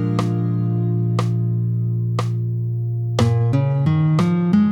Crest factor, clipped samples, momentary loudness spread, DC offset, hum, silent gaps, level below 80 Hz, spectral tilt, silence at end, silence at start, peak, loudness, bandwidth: 16 dB; under 0.1%; 6 LU; under 0.1%; none; none; -52 dBFS; -8.5 dB/octave; 0 s; 0 s; -2 dBFS; -20 LUFS; 9 kHz